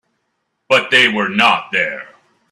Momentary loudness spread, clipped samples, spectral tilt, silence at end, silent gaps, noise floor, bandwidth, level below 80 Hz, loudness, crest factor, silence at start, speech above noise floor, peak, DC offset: 9 LU; under 0.1%; -3 dB/octave; 0.45 s; none; -70 dBFS; 13.5 kHz; -62 dBFS; -13 LUFS; 18 dB; 0.7 s; 55 dB; 0 dBFS; under 0.1%